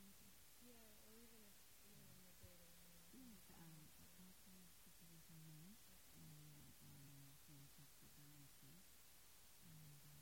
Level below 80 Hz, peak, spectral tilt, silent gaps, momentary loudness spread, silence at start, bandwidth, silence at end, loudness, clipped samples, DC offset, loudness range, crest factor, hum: -80 dBFS; -50 dBFS; -3.5 dB/octave; none; 3 LU; 0 s; 16.5 kHz; 0 s; -65 LUFS; under 0.1%; under 0.1%; 1 LU; 14 dB; none